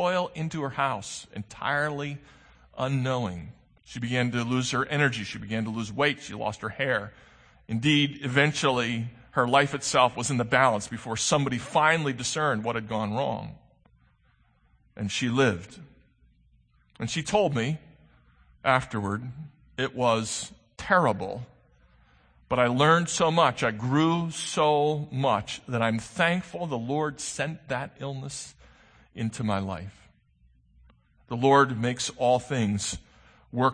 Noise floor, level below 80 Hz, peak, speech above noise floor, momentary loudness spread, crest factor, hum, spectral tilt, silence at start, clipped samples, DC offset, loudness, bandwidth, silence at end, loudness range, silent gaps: -64 dBFS; -58 dBFS; -4 dBFS; 38 dB; 15 LU; 22 dB; none; -4.5 dB/octave; 0 s; under 0.1%; under 0.1%; -26 LUFS; 9.8 kHz; 0 s; 8 LU; none